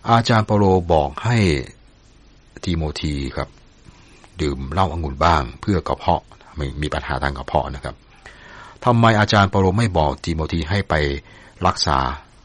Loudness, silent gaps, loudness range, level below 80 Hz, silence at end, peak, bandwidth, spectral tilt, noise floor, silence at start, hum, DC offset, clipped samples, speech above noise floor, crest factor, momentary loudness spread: -20 LUFS; none; 6 LU; -34 dBFS; 0.25 s; -2 dBFS; 10.5 kHz; -6 dB/octave; -49 dBFS; 0.05 s; none; under 0.1%; under 0.1%; 30 dB; 18 dB; 14 LU